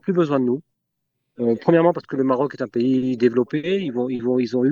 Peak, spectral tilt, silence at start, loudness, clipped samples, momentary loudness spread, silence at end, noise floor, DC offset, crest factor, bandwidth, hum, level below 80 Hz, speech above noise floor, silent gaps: -2 dBFS; -8.5 dB/octave; 0.05 s; -21 LUFS; under 0.1%; 7 LU; 0 s; -77 dBFS; under 0.1%; 18 dB; 7.2 kHz; none; -68 dBFS; 57 dB; none